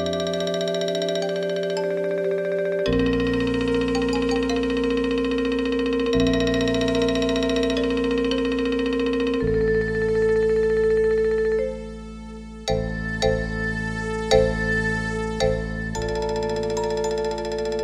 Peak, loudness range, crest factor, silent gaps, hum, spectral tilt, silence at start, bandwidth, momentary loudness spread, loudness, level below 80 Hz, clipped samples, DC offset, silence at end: -4 dBFS; 3 LU; 18 dB; none; none; -5.5 dB/octave; 0 s; 11.5 kHz; 7 LU; -23 LUFS; -36 dBFS; under 0.1%; under 0.1%; 0 s